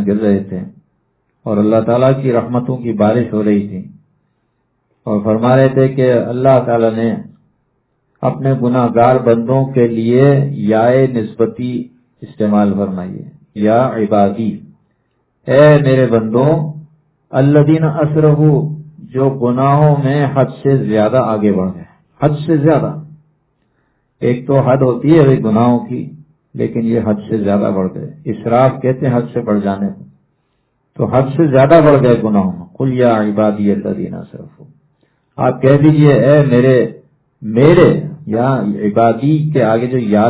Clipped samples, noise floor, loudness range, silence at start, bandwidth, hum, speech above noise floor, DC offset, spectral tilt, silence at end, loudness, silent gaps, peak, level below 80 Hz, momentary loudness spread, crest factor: 0.2%; -64 dBFS; 4 LU; 0 s; 4 kHz; none; 52 dB; under 0.1%; -12.5 dB/octave; 0 s; -13 LUFS; none; 0 dBFS; -46 dBFS; 13 LU; 12 dB